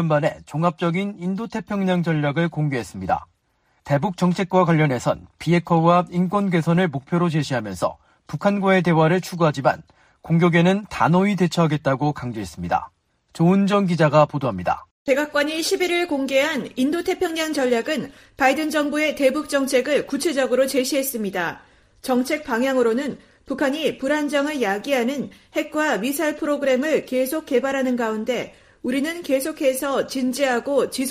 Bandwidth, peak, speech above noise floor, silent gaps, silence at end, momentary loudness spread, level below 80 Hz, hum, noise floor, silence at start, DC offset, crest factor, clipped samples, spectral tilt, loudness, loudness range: 15.5 kHz; -4 dBFS; 45 dB; 14.91-15.06 s; 0 s; 8 LU; -56 dBFS; none; -65 dBFS; 0 s; under 0.1%; 18 dB; under 0.1%; -6 dB/octave; -21 LUFS; 3 LU